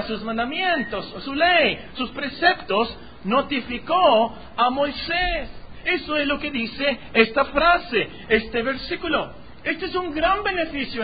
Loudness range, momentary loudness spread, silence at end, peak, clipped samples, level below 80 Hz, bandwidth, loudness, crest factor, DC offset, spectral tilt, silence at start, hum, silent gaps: 1 LU; 10 LU; 0 s; -2 dBFS; under 0.1%; -44 dBFS; 5 kHz; -22 LUFS; 20 dB; 0.8%; -9 dB/octave; 0 s; none; none